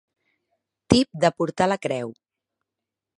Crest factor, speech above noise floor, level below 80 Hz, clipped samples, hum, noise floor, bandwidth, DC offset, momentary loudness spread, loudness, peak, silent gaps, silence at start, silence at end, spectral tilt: 26 dB; 63 dB; -50 dBFS; under 0.1%; none; -86 dBFS; 11 kHz; under 0.1%; 10 LU; -22 LUFS; 0 dBFS; none; 0.9 s; 1.1 s; -5.5 dB/octave